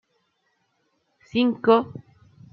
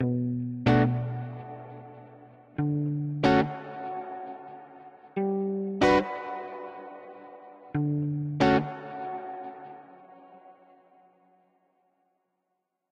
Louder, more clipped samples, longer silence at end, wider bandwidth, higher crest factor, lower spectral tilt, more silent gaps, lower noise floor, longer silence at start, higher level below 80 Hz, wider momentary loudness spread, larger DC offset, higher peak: first, -21 LUFS vs -28 LUFS; neither; second, 0.55 s vs 2.4 s; second, 5.8 kHz vs 9 kHz; about the same, 22 dB vs 22 dB; about the same, -7.5 dB/octave vs -7.5 dB/octave; neither; second, -71 dBFS vs -81 dBFS; first, 1.35 s vs 0 s; second, -68 dBFS vs -56 dBFS; second, 19 LU vs 23 LU; neither; first, -4 dBFS vs -8 dBFS